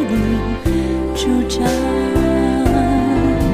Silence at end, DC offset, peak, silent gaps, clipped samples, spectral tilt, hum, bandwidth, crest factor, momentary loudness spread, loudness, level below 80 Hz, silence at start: 0 s; under 0.1%; -4 dBFS; none; under 0.1%; -6.5 dB/octave; none; 16 kHz; 12 dB; 3 LU; -17 LUFS; -24 dBFS; 0 s